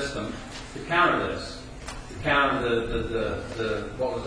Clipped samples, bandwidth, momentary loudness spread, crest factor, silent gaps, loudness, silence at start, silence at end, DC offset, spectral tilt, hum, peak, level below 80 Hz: under 0.1%; 10.5 kHz; 16 LU; 18 dB; none; -26 LUFS; 0 s; 0 s; under 0.1%; -5 dB/octave; none; -8 dBFS; -42 dBFS